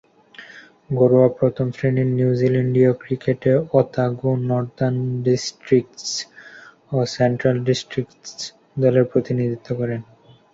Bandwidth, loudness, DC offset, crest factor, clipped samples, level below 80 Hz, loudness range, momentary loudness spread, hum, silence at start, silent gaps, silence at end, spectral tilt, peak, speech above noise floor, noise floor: 7.8 kHz; -20 LUFS; under 0.1%; 18 dB; under 0.1%; -56 dBFS; 4 LU; 12 LU; none; 0.4 s; none; 0.5 s; -6.5 dB/octave; -2 dBFS; 25 dB; -44 dBFS